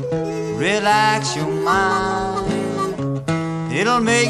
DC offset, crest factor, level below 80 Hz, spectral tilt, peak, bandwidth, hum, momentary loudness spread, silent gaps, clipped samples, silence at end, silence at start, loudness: under 0.1%; 16 dB; -44 dBFS; -4.5 dB/octave; -2 dBFS; 13 kHz; none; 7 LU; none; under 0.1%; 0 s; 0 s; -19 LUFS